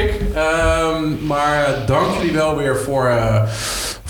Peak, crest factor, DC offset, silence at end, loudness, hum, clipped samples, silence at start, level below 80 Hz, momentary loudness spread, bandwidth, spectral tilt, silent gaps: -4 dBFS; 14 dB; under 0.1%; 0 s; -17 LUFS; none; under 0.1%; 0 s; -30 dBFS; 4 LU; 19 kHz; -5 dB/octave; none